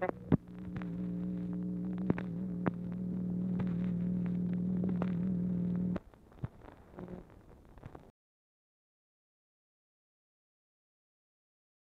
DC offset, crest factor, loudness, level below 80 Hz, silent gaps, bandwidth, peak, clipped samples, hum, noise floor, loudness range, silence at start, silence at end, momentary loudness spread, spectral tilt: under 0.1%; 24 dB; -36 LUFS; -58 dBFS; none; 4 kHz; -14 dBFS; under 0.1%; none; -57 dBFS; 17 LU; 0 s; 3.8 s; 17 LU; -11 dB/octave